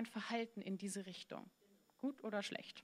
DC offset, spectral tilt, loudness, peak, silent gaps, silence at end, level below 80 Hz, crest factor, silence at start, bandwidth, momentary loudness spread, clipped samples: under 0.1%; -4 dB/octave; -46 LUFS; -26 dBFS; none; 0 s; under -90 dBFS; 20 dB; 0 s; 15 kHz; 10 LU; under 0.1%